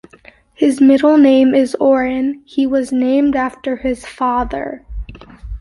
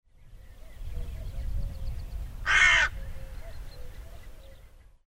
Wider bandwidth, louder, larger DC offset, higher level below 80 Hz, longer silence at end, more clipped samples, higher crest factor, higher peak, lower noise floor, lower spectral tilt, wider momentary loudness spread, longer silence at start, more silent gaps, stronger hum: second, 11.5 kHz vs 16 kHz; first, -14 LUFS vs -24 LUFS; neither; about the same, -36 dBFS vs -38 dBFS; second, 0 s vs 0.25 s; neither; second, 12 dB vs 22 dB; first, -2 dBFS vs -10 dBFS; second, -45 dBFS vs -52 dBFS; first, -6 dB/octave vs -1.5 dB/octave; second, 18 LU vs 27 LU; first, 0.6 s vs 0.2 s; neither; neither